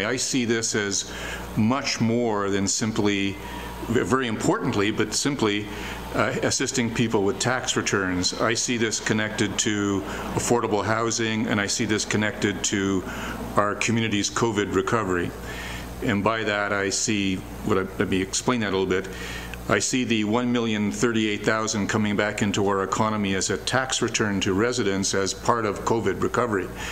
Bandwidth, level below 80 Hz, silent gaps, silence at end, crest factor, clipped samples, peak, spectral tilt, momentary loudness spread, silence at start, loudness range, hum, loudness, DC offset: 16.5 kHz; -46 dBFS; none; 0 s; 20 dB; under 0.1%; -4 dBFS; -4 dB/octave; 5 LU; 0 s; 1 LU; none; -24 LUFS; 0.3%